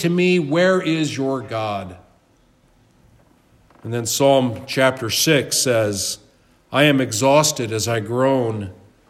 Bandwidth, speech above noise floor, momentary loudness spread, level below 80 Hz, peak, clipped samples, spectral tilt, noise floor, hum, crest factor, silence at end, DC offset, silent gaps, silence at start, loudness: 16 kHz; 38 dB; 11 LU; -60 dBFS; -2 dBFS; under 0.1%; -4 dB/octave; -57 dBFS; none; 18 dB; 0.35 s; under 0.1%; none; 0 s; -18 LUFS